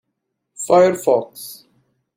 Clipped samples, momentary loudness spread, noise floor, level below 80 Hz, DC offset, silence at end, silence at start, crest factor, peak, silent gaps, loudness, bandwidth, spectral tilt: under 0.1%; 20 LU; -76 dBFS; -64 dBFS; under 0.1%; 0.65 s; 0.6 s; 16 dB; -2 dBFS; none; -16 LUFS; 16.5 kHz; -5 dB/octave